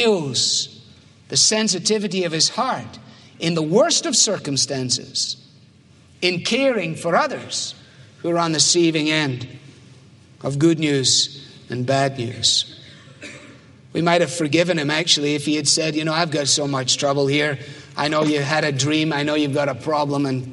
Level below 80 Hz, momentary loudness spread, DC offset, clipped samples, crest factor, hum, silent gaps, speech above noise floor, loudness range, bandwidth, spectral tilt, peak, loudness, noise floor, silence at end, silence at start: -64 dBFS; 13 LU; under 0.1%; under 0.1%; 20 dB; none; none; 30 dB; 3 LU; 11.5 kHz; -3 dB/octave; -2 dBFS; -19 LUFS; -50 dBFS; 0 s; 0 s